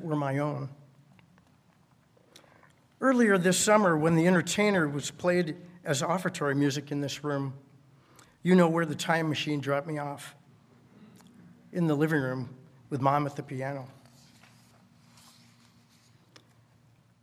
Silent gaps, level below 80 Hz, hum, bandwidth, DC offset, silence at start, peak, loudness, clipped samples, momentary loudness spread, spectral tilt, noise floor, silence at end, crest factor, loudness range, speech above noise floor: none; -72 dBFS; none; 16 kHz; under 0.1%; 0 s; -8 dBFS; -28 LUFS; under 0.1%; 16 LU; -5 dB/octave; -63 dBFS; 3.3 s; 22 dB; 10 LU; 36 dB